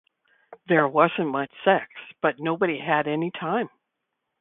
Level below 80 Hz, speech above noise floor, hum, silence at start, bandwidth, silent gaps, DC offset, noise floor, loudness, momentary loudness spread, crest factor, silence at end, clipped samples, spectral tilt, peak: -70 dBFS; 57 dB; none; 0.5 s; 4 kHz; none; under 0.1%; -80 dBFS; -24 LUFS; 7 LU; 22 dB; 0.75 s; under 0.1%; -10.5 dB/octave; -2 dBFS